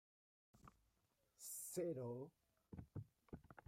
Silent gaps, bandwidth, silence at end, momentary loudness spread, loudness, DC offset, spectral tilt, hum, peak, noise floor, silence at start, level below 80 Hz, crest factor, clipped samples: none; 16 kHz; 0.1 s; 21 LU; -52 LUFS; under 0.1%; -5.5 dB/octave; none; -36 dBFS; -84 dBFS; 0.55 s; -76 dBFS; 18 dB; under 0.1%